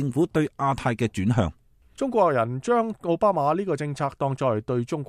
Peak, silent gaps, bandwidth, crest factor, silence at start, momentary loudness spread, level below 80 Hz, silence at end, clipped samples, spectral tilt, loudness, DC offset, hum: -6 dBFS; none; 13.5 kHz; 18 dB; 0 s; 6 LU; -50 dBFS; 0.05 s; under 0.1%; -7.5 dB/octave; -24 LUFS; under 0.1%; none